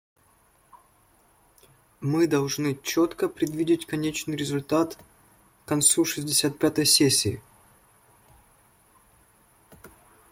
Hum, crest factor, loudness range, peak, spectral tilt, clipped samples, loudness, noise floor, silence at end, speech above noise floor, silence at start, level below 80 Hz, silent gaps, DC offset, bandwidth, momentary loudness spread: none; 22 dB; 6 LU; -6 dBFS; -3.5 dB/octave; under 0.1%; -24 LUFS; -62 dBFS; 0.45 s; 37 dB; 0.75 s; -62 dBFS; none; under 0.1%; 16.5 kHz; 11 LU